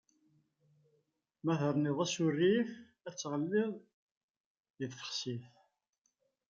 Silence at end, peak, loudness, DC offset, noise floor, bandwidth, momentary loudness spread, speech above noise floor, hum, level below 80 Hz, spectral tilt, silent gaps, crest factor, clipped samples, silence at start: 1 s; -20 dBFS; -35 LUFS; under 0.1%; -82 dBFS; 9 kHz; 15 LU; 48 dB; none; -82 dBFS; -5.5 dB/octave; 3.93-4.55 s, 4.70-4.74 s; 18 dB; under 0.1%; 1.45 s